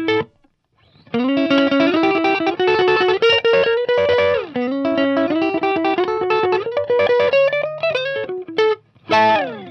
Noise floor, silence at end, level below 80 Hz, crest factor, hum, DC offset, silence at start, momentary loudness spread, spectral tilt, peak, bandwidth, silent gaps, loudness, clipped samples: -59 dBFS; 0 s; -58 dBFS; 12 dB; none; under 0.1%; 0 s; 7 LU; -5.5 dB/octave; -6 dBFS; 6.6 kHz; none; -17 LUFS; under 0.1%